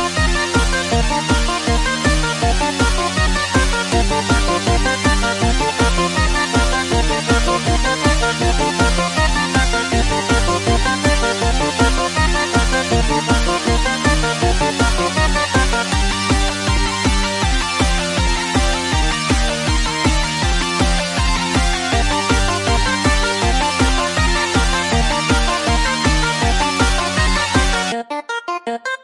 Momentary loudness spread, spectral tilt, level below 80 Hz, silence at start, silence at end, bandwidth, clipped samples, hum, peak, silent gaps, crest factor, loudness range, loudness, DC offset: 2 LU; -3.5 dB/octave; -20 dBFS; 0 s; 0.1 s; 11.5 kHz; under 0.1%; none; -2 dBFS; none; 14 dB; 1 LU; -16 LUFS; under 0.1%